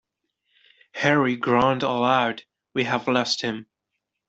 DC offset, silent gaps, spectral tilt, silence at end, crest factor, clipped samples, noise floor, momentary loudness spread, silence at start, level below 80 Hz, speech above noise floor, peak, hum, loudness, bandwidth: under 0.1%; none; -5 dB/octave; 0.65 s; 20 dB; under 0.1%; -81 dBFS; 11 LU; 0.95 s; -62 dBFS; 59 dB; -4 dBFS; none; -22 LUFS; 8 kHz